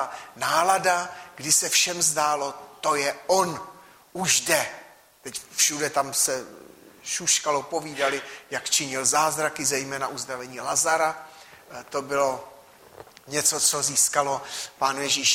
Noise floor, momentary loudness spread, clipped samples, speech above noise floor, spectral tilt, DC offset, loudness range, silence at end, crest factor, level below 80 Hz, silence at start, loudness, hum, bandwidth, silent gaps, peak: -48 dBFS; 14 LU; under 0.1%; 23 dB; -1 dB/octave; under 0.1%; 4 LU; 0 s; 20 dB; -68 dBFS; 0 s; -23 LUFS; none; 16 kHz; none; -6 dBFS